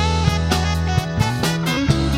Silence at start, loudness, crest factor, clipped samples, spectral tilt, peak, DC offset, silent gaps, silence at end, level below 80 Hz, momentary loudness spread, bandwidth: 0 s; -19 LUFS; 16 dB; under 0.1%; -5 dB/octave; -2 dBFS; under 0.1%; none; 0 s; -28 dBFS; 2 LU; 16 kHz